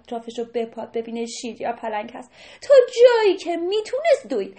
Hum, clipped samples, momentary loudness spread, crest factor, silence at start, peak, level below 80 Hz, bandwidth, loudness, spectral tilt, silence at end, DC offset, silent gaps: none; under 0.1%; 16 LU; 20 dB; 0.1 s; -2 dBFS; -66 dBFS; 8.8 kHz; -20 LUFS; -3 dB/octave; 0.05 s; under 0.1%; none